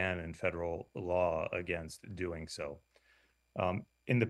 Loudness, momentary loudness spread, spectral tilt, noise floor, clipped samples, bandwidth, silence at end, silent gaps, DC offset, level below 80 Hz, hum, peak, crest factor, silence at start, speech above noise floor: -38 LUFS; 11 LU; -6.5 dB/octave; -71 dBFS; under 0.1%; 12.5 kHz; 0 s; none; under 0.1%; -58 dBFS; none; -16 dBFS; 22 dB; 0 s; 34 dB